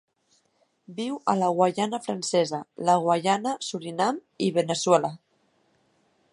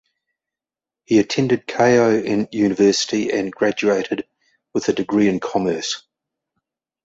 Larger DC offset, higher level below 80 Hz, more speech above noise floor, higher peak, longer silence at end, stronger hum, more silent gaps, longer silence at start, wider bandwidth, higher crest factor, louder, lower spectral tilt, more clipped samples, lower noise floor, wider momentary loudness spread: neither; second, -74 dBFS vs -58 dBFS; second, 44 dB vs 72 dB; about the same, -4 dBFS vs -4 dBFS; about the same, 1.15 s vs 1.05 s; neither; neither; second, 0.9 s vs 1.1 s; first, 11.5 kHz vs 8 kHz; first, 22 dB vs 16 dB; second, -25 LUFS vs -19 LUFS; about the same, -4.5 dB/octave vs -5 dB/octave; neither; second, -69 dBFS vs -89 dBFS; about the same, 10 LU vs 10 LU